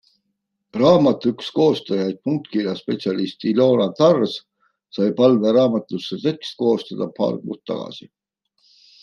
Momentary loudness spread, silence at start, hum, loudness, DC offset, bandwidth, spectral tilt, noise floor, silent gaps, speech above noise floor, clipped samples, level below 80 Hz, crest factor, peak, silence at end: 13 LU; 0.75 s; none; -20 LUFS; under 0.1%; 7.2 kHz; -7.5 dB/octave; -75 dBFS; none; 56 dB; under 0.1%; -64 dBFS; 18 dB; -2 dBFS; 1 s